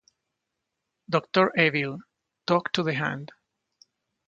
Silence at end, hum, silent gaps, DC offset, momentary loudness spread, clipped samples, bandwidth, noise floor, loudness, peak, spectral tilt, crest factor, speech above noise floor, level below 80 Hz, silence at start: 1 s; none; none; under 0.1%; 16 LU; under 0.1%; 7.8 kHz; -83 dBFS; -25 LUFS; -6 dBFS; -6 dB/octave; 22 dB; 58 dB; -70 dBFS; 1.1 s